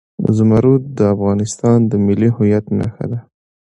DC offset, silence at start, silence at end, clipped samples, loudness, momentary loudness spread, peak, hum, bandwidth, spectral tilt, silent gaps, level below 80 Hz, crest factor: under 0.1%; 0.2 s; 0.55 s; under 0.1%; -15 LUFS; 10 LU; 0 dBFS; none; 11 kHz; -8.5 dB/octave; none; -42 dBFS; 14 dB